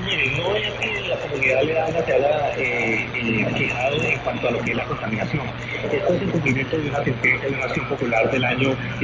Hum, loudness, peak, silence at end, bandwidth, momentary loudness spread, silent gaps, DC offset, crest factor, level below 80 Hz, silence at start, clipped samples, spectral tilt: none; -21 LUFS; -6 dBFS; 0 s; 7.8 kHz; 5 LU; none; under 0.1%; 16 dB; -44 dBFS; 0 s; under 0.1%; -6 dB/octave